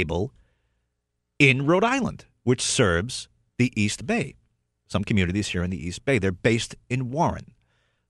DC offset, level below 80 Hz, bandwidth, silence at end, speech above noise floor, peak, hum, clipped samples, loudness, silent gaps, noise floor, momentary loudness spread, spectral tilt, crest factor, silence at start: under 0.1%; -48 dBFS; 12 kHz; 0.65 s; 55 dB; -4 dBFS; none; under 0.1%; -24 LUFS; none; -78 dBFS; 12 LU; -5 dB/octave; 22 dB; 0 s